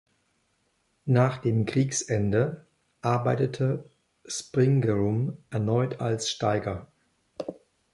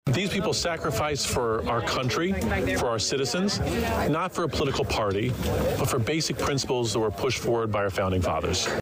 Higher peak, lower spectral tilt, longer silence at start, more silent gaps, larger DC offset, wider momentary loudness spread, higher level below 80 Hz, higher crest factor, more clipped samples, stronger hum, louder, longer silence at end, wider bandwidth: first, -10 dBFS vs -16 dBFS; first, -6 dB/octave vs -4.5 dB/octave; first, 1.05 s vs 0.05 s; neither; neither; first, 15 LU vs 1 LU; second, -56 dBFS vs -42 dBFS; first, 18 dB vs 8 dB; neither; neither; about the same, -27 LUFS vs -26 LUFS; first, 0.4 s vs 0 s; second, 11.5 kHz vs 16 kHz